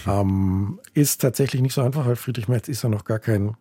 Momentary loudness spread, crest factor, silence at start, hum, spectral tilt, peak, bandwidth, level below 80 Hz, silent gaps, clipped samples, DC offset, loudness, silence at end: 5 LU; 16 dB; 0 s; none; -6 dB/octave; -6 dBFS; 17 kHz; -52 dBFS; none; under 0.1%; under 0.1%; -22 LUFS; 0.05 s